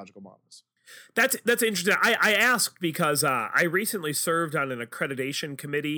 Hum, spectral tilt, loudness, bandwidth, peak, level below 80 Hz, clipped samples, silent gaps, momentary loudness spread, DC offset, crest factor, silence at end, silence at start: none; -3 dB/octave; -24 LUFS; over 20 kHz; -8 dBFS; -76 dBFS; under 0.1%; none; 11 LU; under 0.1%; 18 dB; 0 s; 0 s